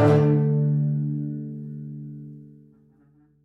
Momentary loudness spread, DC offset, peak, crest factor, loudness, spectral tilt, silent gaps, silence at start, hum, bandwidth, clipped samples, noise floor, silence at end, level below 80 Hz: 21 LU; under 0.1%; -6 dBFS; 18 dB; -23 LUFS; -10 dB/octave; none; 0 s; none; 5.6 kHz; under 0.1%; -59 dBFS; 0.95 s; -60 dBFS